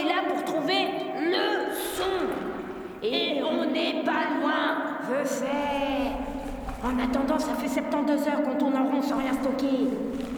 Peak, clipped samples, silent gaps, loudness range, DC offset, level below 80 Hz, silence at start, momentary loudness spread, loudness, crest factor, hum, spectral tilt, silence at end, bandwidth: -12 dBFS; under 0.1%; none; 2 LU; under 0.1%; -48 dBFS; 0 s; 6 LU; -27 LUFS; 14 dB; none; -4 dB/octave; 0 s; over 20 kHz